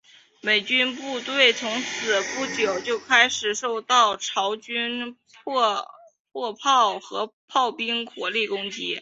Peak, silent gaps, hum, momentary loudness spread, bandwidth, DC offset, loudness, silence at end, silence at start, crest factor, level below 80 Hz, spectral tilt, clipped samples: -4 dBFS; 6.20-6.25 s, 7.33-7.48 s; none; 13 LU; 8 kHz; under 0.1%; -23 LUFS; 0 s; 0.45 s; 22 dB; -72 dBFS; -1 dB/octave; under 0.1%